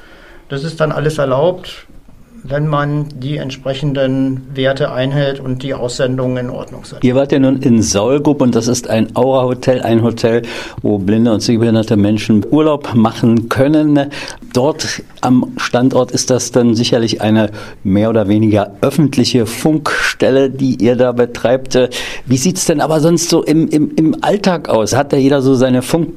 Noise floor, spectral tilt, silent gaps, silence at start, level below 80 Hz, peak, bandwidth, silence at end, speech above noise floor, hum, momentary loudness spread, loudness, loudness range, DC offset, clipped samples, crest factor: -38 dBFS; -5.5 dB/octave; none; 0.5 s; -40 dBFS; 0 dBFS; 15 kHz; 0 s; 25 dB; none; 8 LU; -13 LUFS; 5 LU; under 0.1%; under 0.1%; 12 dB